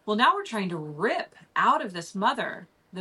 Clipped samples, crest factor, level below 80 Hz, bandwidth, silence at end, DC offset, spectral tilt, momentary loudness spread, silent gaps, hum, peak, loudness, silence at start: under 0.1%; 20 dB; -76 dBFS; 12 kHz; 0 s; under 0.1%; -4.5 dB/octave; 12 LU; none; none; -6 dBFS; -27 LUFS; 0.05 s